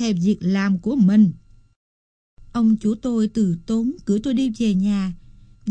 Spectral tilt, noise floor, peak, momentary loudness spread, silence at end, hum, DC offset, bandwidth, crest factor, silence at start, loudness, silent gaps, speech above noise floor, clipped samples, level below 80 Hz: -7.5 dB/octave; under -90 dBFS; -6 dBFS; 7 LU; 0 s; none; under 0.1%; 8.6 kHz; 14 dB; 0 s; -20 LUFS; 1.76-2.37 s; over 71 dB; under 0.1%; -48 dBFS